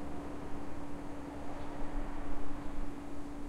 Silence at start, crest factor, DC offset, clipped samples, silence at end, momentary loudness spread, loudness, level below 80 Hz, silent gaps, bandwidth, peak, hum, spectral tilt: 0 s; 12 dB; under 0.1%; under 0.1%; 0 s; 2 LU; -45 LUFS; -44 dBFS; none; 10.5 kHz; -22 dBFS; none; -6.5 dB/octave